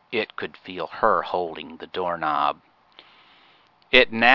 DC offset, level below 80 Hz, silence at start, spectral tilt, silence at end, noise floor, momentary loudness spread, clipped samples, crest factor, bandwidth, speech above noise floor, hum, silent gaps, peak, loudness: under 0.1%; -54 dBFS; 0.1 s; -5 dB/octave; 0 s; -57 dBFS; 16 LU; under 0.1%; 24 dB; 6 kHz; 35 dB; none; none; 0 dBFS; -23 LUFS